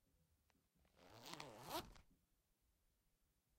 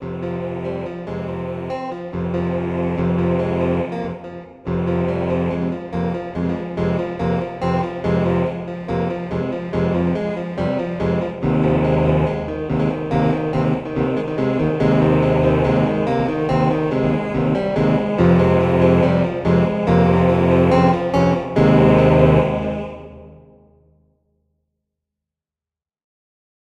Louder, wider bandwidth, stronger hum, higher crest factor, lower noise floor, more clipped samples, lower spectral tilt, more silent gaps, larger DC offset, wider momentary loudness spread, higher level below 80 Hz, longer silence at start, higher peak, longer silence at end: second, -54 LUFS vs -19 LUFS; first, 16 kHz vs 7.4 kHz; neither; first, 28 dB vs 18 dB; second, -84 dBFS vs under -90 dBFS; neither; second, -3 dB/octave vs -9 dB/octave; neither; neither; about the same, 14 LU vs 12 LU; second, -76 dBFS vs -38 dBFS; first, 0.15 s vs 0 s; second, -32 dBFS vs -2 dBFS; second, 1.45 s vs 3.3 s